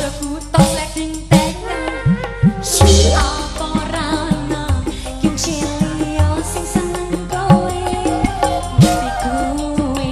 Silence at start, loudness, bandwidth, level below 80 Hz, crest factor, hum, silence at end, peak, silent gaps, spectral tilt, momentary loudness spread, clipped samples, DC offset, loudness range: 0 s; -17 LUFS; 14 kHz; -24 dBFS; 16 dB; none; 0 s; 0 dBFS; none; -5 dB/octave; 8 LU; under 0.1%; under 0.1%; 4 LU